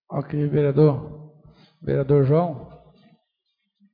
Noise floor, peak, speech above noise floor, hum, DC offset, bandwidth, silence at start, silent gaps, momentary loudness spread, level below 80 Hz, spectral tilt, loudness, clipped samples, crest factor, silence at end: -76 dBFS; -6 dBFS; 56 dB; none; under 0.1%; 4.8 kHz; 0.1 s; none; 17 LU; -52 dBFS; -12.5 dB/octave; -21 LUFS; under 0.1%; 18 dB; 1.2 s